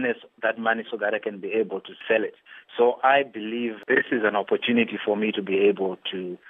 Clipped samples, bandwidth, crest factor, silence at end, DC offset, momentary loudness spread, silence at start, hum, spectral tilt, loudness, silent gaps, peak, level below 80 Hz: under 0.1%; 3.9 kHz; 18 dB; 0 s; under 0.1%; 9 LU; 0 s; none; -7.5 dB/octave; -24 LUFS; none; -6 dBFS; -82 dBFS